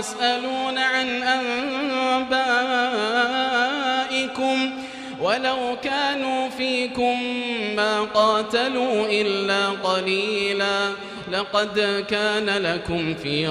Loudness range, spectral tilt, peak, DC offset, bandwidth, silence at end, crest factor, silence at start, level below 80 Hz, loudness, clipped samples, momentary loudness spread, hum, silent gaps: 2 LU; -3.5 dB/octave; -6 dBFS; under 0.1%; 13 kHz; 0 s; 16 dB; 0 s; -58 dBFS; -22 LUFS; under 0.1%; 5 LU; none; none